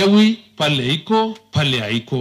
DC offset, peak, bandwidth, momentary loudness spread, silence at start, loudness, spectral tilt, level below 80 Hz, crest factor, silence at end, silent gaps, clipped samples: under 0.1%; -2 dBFS; 13.5 kHz; 6 LU; 0 s; -18 LUFS; -5.5 dB/octave; -56 dBFS; 14 dB; 0 s; none; under 0.1%